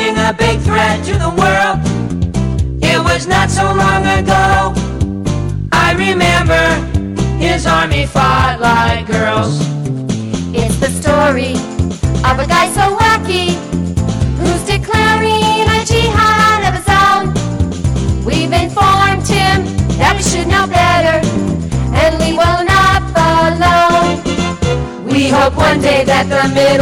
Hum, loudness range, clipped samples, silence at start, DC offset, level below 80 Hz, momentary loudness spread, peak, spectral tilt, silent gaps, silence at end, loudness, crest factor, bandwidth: none; 2 LU; under 0.1%; 0 s; under 0.1%; -24 dBFS; 7 LU; -4 dBFS; -5 dB/octave; none; 0 s; -12 LUFS; 8 dB; 17.5 kHz